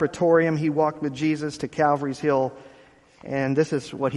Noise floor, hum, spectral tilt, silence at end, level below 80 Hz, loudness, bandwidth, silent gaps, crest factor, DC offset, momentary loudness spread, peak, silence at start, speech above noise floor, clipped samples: -53 dBFS; none; -7 dB/octave; 0 s; -60 dBFS; -23 LUFS; 11.5 kHz; none; 16 dB; under 0.1%; 8 LU; -6 dBFS; 0 s; 30 dB; under 0.1%